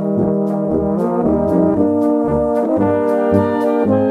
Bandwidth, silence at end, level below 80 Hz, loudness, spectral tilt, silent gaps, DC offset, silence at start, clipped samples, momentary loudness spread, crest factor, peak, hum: 11.5 kHz; 0 s; -40 dBFS; -16 LUFS; -10 dB/octave; none; under 0.1%; 0 s; under 0.1%; 3 LU; 12 dB; -2 dBFS; none